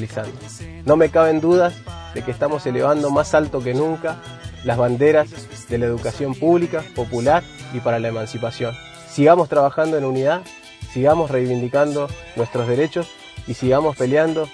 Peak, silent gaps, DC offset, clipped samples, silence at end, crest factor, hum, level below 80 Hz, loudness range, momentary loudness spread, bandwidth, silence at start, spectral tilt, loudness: 0 dBFS; none; under 0.1%; under 0.1%; 0 s; 18 dB; none; -46 dBFS; 3 LU; 16 LU; 11 kHz; 0 s; -6.5 dB/octave; -19 LUFS